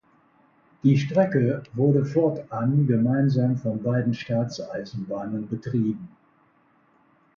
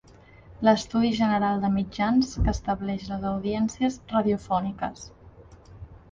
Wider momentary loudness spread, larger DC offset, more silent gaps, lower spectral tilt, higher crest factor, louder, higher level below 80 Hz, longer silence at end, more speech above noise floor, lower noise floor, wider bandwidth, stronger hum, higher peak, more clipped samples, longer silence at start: about the same, 10 LU vs 8 LU; neither; neither; first, -8.5 dB/octave vs -6 dB/octave; about the same, 18 dB vs 20 dB; about the same, -24 LUFS vs -26 LUFS; second, -62 dBFS vs -40 dBFS; first, 1.3 s vs 0.15 s; first, 39 dB vs 26 dB; first, -62 dBFS vs -51 dBFS; about the same, 7 kHz vs 7.6 kHz; neither; about the same, -6 dBFS vs -6 dBFS; neither; first, 0.85 s vs 0.5 s